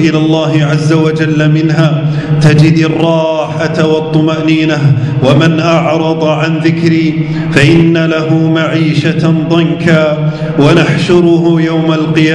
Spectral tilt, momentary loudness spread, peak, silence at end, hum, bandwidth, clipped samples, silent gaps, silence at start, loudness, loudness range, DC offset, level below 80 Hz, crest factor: -7 dB/octave; 4 LU; 0 dBFS; 0 s; none; 10.5 kHz; 2%; none; 0 s; -9 LUFS; 1 LU; under 0.1%; -40 dBFS; 8 dB